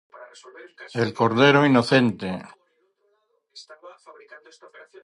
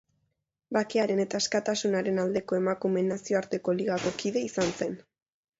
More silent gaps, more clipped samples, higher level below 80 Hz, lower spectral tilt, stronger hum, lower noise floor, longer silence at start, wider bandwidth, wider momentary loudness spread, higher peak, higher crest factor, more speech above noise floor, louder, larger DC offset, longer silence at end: neither; neither; about the same, -64 dBFS vs -66 dBFS; first, -6 dB/octave vs -4.5 dB/octave; neither; second, -69 dBFS vs -79 dBFS; second, 0.2 s vs 0.7 s; first, 11.5 kHz vs 8 kHz; first, 20 LU vs 4 LU; first, -4 dBFS vs -12 dBFS; about the same, 20 dB vs 16 dB; second, 46 dB vs 51 dB; first, -20 LUFS vs -29 LUFS; neither; first, 1.15 s vs 0.6 s